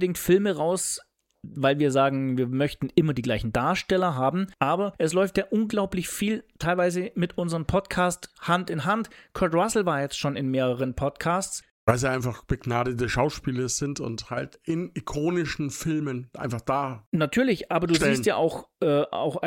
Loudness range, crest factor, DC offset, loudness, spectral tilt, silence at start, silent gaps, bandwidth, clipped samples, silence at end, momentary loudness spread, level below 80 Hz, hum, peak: 4 LU; 20 dB; under 0.1%; -26 LUFS; -5 dB/octave; 0 s; 11.71-11.87 s, 17.06-17.12 s; 17 kHz; under 0.1%; 0 s; 8 LU; -48 dBFS; none; -6 dBFS